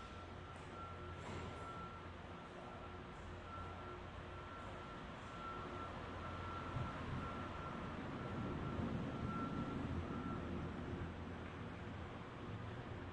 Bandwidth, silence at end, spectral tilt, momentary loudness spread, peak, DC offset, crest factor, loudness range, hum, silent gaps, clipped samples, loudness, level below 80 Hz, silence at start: 10.5 kHz; 0 s; -7 dB/octave; 8 LU; -32 dBFS; under 0.1%; 16 dB; 6 LU; none; none; under 0.1%; -48 LUFS; -60 dBFS; 0 s